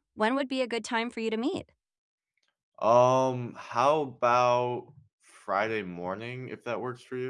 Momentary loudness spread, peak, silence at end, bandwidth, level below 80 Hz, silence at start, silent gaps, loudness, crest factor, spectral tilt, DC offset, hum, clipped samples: 14 LU; -10 dBFS; 0 s; 11 kHz; -76 dBFS; 0.15 s; 1.98-2.18 s, 2.63-2.72 s, 5.13-5.18 s; -28 LUFS; 20 dB; -5.5 dB/octave; under 0.1%; none; under 0.1%